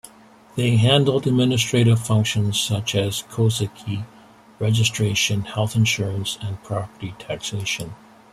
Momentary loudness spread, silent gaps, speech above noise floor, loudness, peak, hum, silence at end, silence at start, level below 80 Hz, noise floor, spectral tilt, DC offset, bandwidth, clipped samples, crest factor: 13 LU; none; 28 dB; -21 LUFS; -2 dBFS; none; 0.35 s; 0.55 s; -52 dBFS; -49 dBFS; -5 dB/octave; under 0.1%; 14.5 kHz; under 0.1%; 20 dB